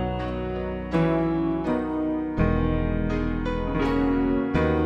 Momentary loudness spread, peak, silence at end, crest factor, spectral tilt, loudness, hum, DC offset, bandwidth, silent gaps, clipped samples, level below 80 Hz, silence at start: 6 LU; -10 dBFS; 0 s; 14 dB; -9 dB/octave; -25 LUFS; none; under 0.1%; 7.8 kHz; none; under 0.1%; -32 dBFS; 0 s